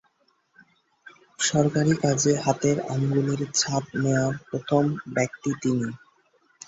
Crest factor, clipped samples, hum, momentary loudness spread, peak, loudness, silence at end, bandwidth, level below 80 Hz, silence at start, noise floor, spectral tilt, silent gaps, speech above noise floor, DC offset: 18 dB; under 0.1%; none; 6 LU; -6 dBFS; -24 LUFS; 0.7 s; 8 kHz; -60 dBFS; 1.05 s; -67 dBFS; -5 dB/octave; none; 43 dB; under 0.1%